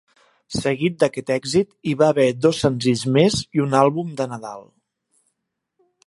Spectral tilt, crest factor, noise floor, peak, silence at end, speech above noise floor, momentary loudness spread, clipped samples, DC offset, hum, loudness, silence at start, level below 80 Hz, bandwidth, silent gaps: -5.5 dB/octave; 20 dB; -78 dBFS; -2 dBFS; 1.45 s; 59 dB; 11 LU; under 0.1%; under 0.1%; none; -20 LUFS; 0.5 s; -54 dBFS; 11.5 kHz; none